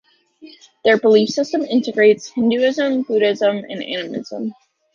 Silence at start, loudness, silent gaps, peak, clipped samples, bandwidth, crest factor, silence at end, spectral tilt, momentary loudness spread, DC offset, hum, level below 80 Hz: 0.45 s; -17 LUFS; none; -2 dBFS; under 0.1%; 7.4 kHz; 16 dB; 0.45 s; -5 dB/octave; 12 LU; under 0.1%; none; -66 dBFS